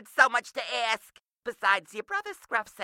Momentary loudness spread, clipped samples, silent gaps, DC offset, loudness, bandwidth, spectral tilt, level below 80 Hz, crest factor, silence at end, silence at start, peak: 11 LU; under 0.1%; 1.25-1.41 s; under 0.1%; -28 LUFS; 16.5 kHz; -0.5 dB/octave; -78 dBFS; 24 dB; 0 s; 0.15 s; -6 dBFS